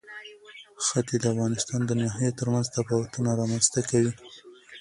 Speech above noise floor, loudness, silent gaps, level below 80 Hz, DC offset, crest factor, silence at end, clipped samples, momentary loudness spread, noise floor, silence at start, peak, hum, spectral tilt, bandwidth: 23 dB; -26 LUFS; none; -60 dBFS; under 0.1%; 20 dB; 0 s; under 0.1%; 21 LU; -49 dBFS; 0.05 s; -6 dBFS; none; -5 dB/octave; 11.5 kHz